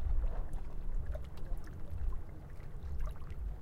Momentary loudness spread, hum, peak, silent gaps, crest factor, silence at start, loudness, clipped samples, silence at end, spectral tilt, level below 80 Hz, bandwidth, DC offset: 7 LU; none; -22 dBFS; none; 12 dB; 0 s; -45 LUFS; under 0.1%; 0 s; -8 dB/octave; -38 dBFS; 4.2 kHz; under 0.1%